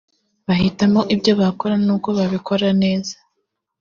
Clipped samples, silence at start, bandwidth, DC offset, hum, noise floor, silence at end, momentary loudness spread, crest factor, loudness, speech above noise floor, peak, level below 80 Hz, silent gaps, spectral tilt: under 0.1%; 0.5 s; 7.2 kHz; under 0.1%; none; -74 dBFS; 0.65 s; 8 LU; 16 dB; -18 LUFS; 57 dB; -2 dBFS; -50 dBFS; none; -5.5 dB/octave